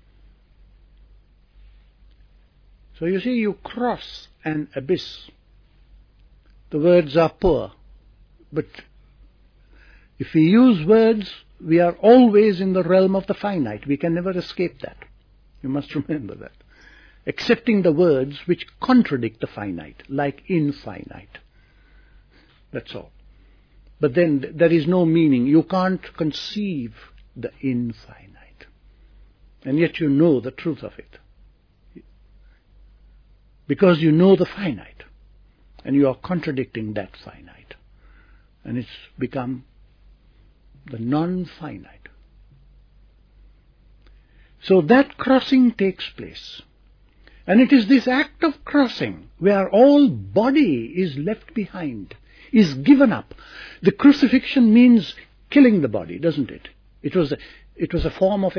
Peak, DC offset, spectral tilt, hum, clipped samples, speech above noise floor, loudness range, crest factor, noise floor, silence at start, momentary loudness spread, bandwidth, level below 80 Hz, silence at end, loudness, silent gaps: -2 dBFS; under 0.1%; -8 dB/octave; none; under 0.1%; 35 dB; 14 LU; 18 dB; -54 dBFS; 3 s; 20 LU; 5.4 kHz; -48 dBFS; 0 s; -19 LUFS; none